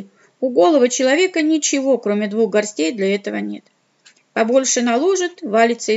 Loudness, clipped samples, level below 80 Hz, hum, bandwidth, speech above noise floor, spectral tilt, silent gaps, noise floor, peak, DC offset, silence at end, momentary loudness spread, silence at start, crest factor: -17 LUFS; under 0.1%; -80 dBFS; none; 8.2 kHz; 37 dB; -3 dB/octave; none; -54 dBFS; -2 dBFS; under 0.1%; 0 s; 10 LU; 0 s; 14 dB